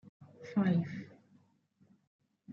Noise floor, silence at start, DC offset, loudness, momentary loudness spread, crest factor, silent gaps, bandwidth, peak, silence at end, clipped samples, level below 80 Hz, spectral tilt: -70 dBFS; 0.2 s; under 0.1%; -34 LUFS; 22 LU; 18 dB; 2.07-2.19 s; 6.8 kHz; -20 dBFS; 0 s; under 0.1%; -80 dBFS; -8 dB/octave